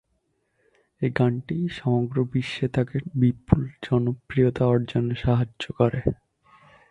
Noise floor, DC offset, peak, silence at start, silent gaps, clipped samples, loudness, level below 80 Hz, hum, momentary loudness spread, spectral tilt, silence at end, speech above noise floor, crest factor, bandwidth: -72 dBFS; under 0.1%; -2 dBFS; 1 s; none; under 0.1%; -24 LUFS; -44 dBFS; none; 6 LU; -8.5 dB/octave; 0.75 s; 49 dB; 24 dB; 8.2 kHz